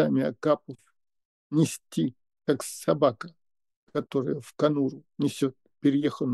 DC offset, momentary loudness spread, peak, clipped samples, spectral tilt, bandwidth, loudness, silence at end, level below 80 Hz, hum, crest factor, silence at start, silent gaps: under 0.1%; 10 LU; -8 dBFS; under 0.1%; -6.5 dB/octave; 12.5 kHz; -28 LUFS; 0 s; -76 dBFS; none; 20 dB; 0 s; 1.25-1.50 s, 3.76-3.87 s